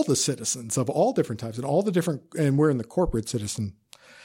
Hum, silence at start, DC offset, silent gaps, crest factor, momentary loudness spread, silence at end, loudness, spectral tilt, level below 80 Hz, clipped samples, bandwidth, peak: none; 0 s; under 0.1%; none; 16 dB; 8 LU; 0 s; -26 LUFS; -5 dB/octave; -46 dBFS; under 0.1%; 16.5 kHz; -10 dBFS